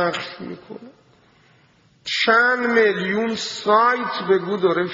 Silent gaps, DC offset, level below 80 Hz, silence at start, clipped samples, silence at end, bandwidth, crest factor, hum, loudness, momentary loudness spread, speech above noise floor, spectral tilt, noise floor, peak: none; under 0.1%; -64 dBFS; 0 s; under 0.1%; 0 s; 7.8 kHz; 18 dB; none; -19 LUFS; 19 LU; 37 dB; -2 dB/octave; -56 dBFS; -2 dBFS